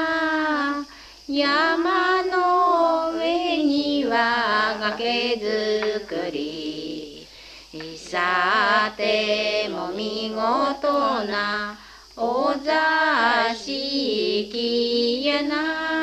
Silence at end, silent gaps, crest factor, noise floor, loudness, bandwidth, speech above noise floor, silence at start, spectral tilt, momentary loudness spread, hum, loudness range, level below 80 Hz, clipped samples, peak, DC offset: 0 s; none; 16 dB; -44 dBFS; -22 LUFS; 14 kHz; 22 dB; 0 s; -3.5 dB/octave; 13 LU; none; 4 LU; -56 dBFS; under 0.1%; -6 dBFS; under 0.1%